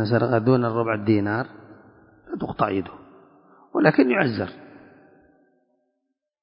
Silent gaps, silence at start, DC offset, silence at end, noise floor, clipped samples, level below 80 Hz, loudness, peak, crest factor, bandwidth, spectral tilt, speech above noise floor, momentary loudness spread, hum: none; 0 s; under 0.1%; 1.75 s; -78 dBFS; under 0.1%; -58 dBFS; -22 LUFS; -2 dBFS; 22 dB; 5.4 kHz; -12 dB/octave; 57 dB; 14 LU; none